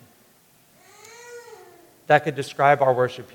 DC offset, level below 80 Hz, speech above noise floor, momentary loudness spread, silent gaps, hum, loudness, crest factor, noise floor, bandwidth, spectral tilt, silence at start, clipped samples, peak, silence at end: under 0.1%; -72 dBFS; 37 dB; 24 LU; none; none; -20 LUFS; 24 dB; -57 dBFS; 19 kHz; -5.5 dB/octave; 1.3 s; under 0.1%; 0 dBFS; 0.1 s